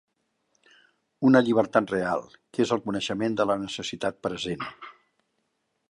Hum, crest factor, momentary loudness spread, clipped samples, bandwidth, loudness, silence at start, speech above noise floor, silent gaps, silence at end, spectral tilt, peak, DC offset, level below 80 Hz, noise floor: none; 22 dB; 14 LU; under 0.1%; 11 kHz; -26 LUFS; 1.2 s; 51 dB; none; 1 s; -5.5 dB/octave; -6 dBFS; under 0.1%; -64 dBFS; -76 dBFS